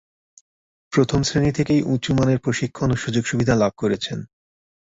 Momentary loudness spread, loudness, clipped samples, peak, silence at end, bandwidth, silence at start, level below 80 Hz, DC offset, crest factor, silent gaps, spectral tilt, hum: 5 LU; -21 LUFS; under 0.1%; -4 dBFS; 0.65 s; 8 kHz; 0.9 s; -44 dBFS; under 0.1%; 18 dB; none; -6 dB/octave; none